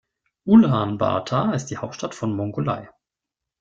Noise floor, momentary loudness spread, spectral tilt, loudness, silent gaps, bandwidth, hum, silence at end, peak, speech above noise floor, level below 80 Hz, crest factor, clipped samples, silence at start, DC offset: -86 dBFS; 16 LU; -7 dB/octave; -21 LUFS; none; 7.6 kHz; none; 0.75 s; -4 dBFS; 66 dB; -56 dBFS; 18 dB; under 0.1%; 0.45 s; under 0.1%